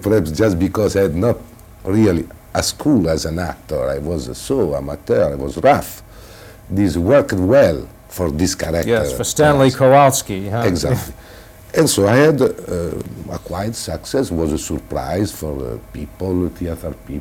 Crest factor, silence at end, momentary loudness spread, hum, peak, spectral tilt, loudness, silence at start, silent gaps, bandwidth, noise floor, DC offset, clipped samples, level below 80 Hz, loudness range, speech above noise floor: 16 dB; 0 s; 14 LU; none; -2 dBFS; -5.5 dB/octave; -17 LUFS; 0 s; none; 18 kHz; -39 dBFS; under 0.1%; under 0.1%; -36 dBFS; 8 LU; 23 dB